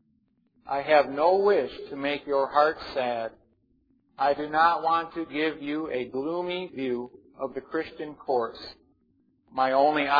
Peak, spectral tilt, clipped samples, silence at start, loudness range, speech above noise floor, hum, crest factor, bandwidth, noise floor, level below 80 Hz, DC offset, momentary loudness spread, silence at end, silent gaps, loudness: -6 dBFS; -6.5 dB/octave; under 0.1%; 0.65 s; 7 LU; 43 dB; none; 20 dB; 5 kHz; -69 dBFS; -64 dBFS; under 0.1%; 13 LU; 0 s; none; -27 LUFS